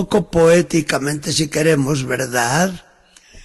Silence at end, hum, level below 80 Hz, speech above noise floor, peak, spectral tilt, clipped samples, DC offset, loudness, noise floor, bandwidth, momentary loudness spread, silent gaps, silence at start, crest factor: 0.05 s; none; -44 dBFS; 33 dB; -4 dBFS; -4.5 dB/octave; under 0.1%; under 0.1%; -17 LUFS; -49 dBFS; 12.5 kHz; 7 LU; none; 0 s; 14 dB